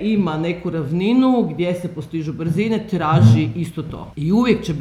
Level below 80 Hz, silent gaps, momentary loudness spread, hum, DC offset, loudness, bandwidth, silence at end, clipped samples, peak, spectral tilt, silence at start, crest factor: -46 dBFS; none; 12 LU; none; under 0.1%; -18 LUFS; 12 kHz; 0 s; under 0.1%; 0 dBFS; -8 dB/octave; 0 s; 18 dB